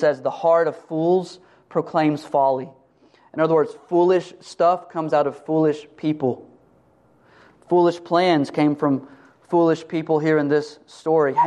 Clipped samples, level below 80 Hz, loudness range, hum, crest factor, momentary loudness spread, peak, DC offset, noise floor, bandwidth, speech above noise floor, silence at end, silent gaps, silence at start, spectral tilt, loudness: under 0.1%; -70 dBFS; 3 LU; none; 16 dB; 8 LU; -4 dBFS; under 0.1%; -57 dBFS; 9.8 kHz; 37 dB; 0 s; none; 0 s; -7 dB/octave; -21 LUFS